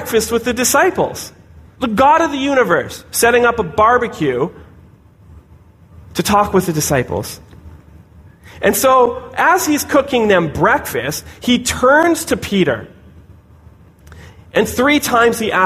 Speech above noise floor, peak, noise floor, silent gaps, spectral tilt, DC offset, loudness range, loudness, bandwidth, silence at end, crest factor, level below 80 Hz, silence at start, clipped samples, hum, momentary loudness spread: 30 dB; -2 dBFS; -45 dBFS; none; -4 dB/octave; under 0.1%; 5 LU; -14 LUFS; 15.5 kHz; 0 s; 14 dB; -42 dBFS; 0 s; under 0.1%; none; 10 LU